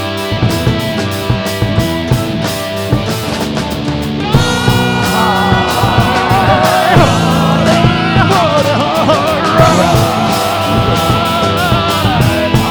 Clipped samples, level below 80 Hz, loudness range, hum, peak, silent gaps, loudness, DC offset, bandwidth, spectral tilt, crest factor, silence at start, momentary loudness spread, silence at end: 0.2%; -28 dBFS; 5 LU; none; 0 dBFS; none; -11 LUFS; under 0.1%; over 20 kHz; -5.5 dB/octave; 12 dB; 0 s; 7 LU; 0 s